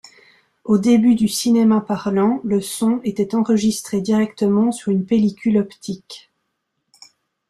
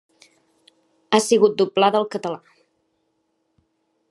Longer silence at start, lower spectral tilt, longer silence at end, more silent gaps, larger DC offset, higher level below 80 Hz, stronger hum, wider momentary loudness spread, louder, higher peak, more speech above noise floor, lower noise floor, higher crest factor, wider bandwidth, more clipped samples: second, 0.65 s vs 1.1 s; first, -6 dB/octave vs -4 dB/octave; second, 1.3 s vs 1.75 s; neither; neither; first, -58 dBFS vs -80 dBFS; neither; about the same, 13 LU vs 13 LU; about the same, -18 LUFS vs -19 LUFS; about the same, -4 dBFS vs -2 dBFS; first, 56 dB vs 52 dB; about the same, -74 dBFS vs -71 dBFS; second, 14 dB vs 22 dB; about the same, 13.5 kHz vs 12.5 kHz; neither